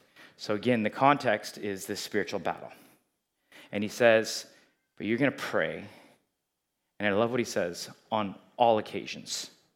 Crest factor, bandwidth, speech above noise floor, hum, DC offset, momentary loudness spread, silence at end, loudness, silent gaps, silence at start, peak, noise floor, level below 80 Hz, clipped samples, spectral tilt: 24 dB; 16.5 kHz; 54 dB; none; under 0.1%; 14 LU; 0.25 s; -29 LUFS; none; 0.2 s; -6 dBFS; -82 dBFS; -80 dBFS; under 0.1%; -4.5 dB/octave